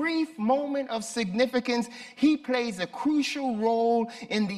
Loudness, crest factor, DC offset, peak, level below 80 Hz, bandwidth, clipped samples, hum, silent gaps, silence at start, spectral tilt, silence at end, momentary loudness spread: -27 LUFS; 16 dB; under 0.1%; -12 dBFS; -68 dBFS; 13.5 kHz; under 0.1%; none; none; 0 s; -4.5 dB/octave; 0 s; 5 LU